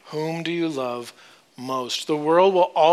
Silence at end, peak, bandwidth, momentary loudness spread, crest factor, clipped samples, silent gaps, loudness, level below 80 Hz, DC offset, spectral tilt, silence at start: 0 s; -4 dBFS; 14.5 kHz; 15 LU; 18 dB; under 0.1%; none; -22 LUFS; -76 dBFS; under 0.1%; -5 dB/octave; 0.05 s